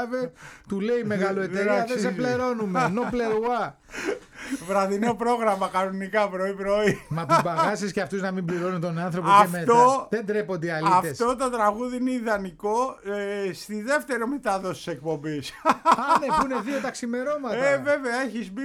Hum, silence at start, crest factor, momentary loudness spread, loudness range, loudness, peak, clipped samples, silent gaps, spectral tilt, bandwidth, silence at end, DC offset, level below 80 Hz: none; 0 s; 20 dB; 10 LU; 5 LU; -24 LUFS; -4 dBFS; under 0.1%; none; -5.5 dB/octave; 18 kHz; 0 s; under 0.1%; -56 dBFS